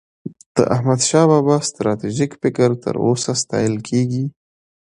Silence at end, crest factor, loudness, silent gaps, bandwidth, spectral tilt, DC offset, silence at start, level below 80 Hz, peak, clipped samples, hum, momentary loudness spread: 0.6 s; 18 dB; -18 LUFS; 0.46-0.55 s; 11 kHz; -5.5 dB/octave; under 0.1%; 0.25 s; -54 dBFS; 0 dBFS; under 0.1%; none; 9 LU